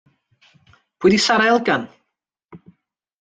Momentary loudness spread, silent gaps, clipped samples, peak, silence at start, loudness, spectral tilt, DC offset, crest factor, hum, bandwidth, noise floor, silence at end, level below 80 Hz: 8 LU; none; under 0.1%; -4 dBFS; 1 s; -17 LUFS; -4 dB/octave; under 0.1%; 18 dB; none; 9.4 kHz; -78 dBFS; 0.65 s; -58 dBFS